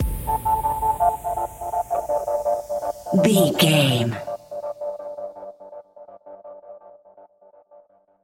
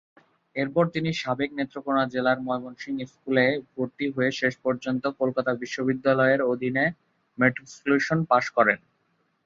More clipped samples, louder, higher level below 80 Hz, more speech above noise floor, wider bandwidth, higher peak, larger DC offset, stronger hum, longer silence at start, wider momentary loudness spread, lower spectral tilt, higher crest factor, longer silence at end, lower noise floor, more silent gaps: neither; first, -22 LUFS vs -25 LUFS; first, -40 dBFS vs -66 dBFS; second, 36 dB vs 46 dB; first, 17 kHz vs 7.6 kHz; about the same, -2 dBFS vs -4 dBFS; neither; neither; second, 0 s vs 0.55 s; first, 25 LU vs 9 LU; about the same, -5 dB/octave vs -6 dB/octave; about the same, 20 dB vs 20 dB; first, 1 s vs 0.7 s; second, -53 dBFS vs -70 dBFS; neither